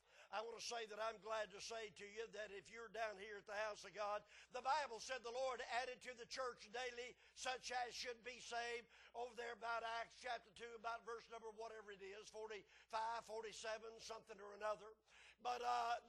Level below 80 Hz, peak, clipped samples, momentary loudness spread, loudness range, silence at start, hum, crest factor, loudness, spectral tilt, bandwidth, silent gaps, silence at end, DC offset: -82 dBFS; -30 dBFS; under 0.1%; 10 LU; 4 LU; 0.1 s; none; 20 dB; -50 LUFS; -1 dB/octave; 12 kHz; none; 0 s; under 0.1%